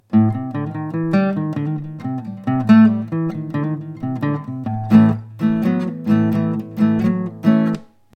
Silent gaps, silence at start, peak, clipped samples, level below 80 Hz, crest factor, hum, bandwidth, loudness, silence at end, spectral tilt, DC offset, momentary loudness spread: none; 0.1 s; 0 dBFS; under 0.1%; -56 dBFS; 18 dB; none; 5.6 kHz; -18 LUFS; 0.3 s; -9.5 dB/octave; under 0.1%; 13 LU